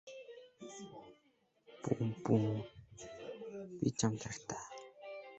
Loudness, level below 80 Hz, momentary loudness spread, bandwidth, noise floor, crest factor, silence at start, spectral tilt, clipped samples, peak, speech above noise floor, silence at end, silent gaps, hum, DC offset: -39 LUFS; -70 dBFS; 19 LU; 8.2 kHz; -74 dBFS; 22 dB; 0.05 s; -6 dB/octave; under 0.1%; -18 dBFS; 38 dB; 0 s; none; none; under 0.1%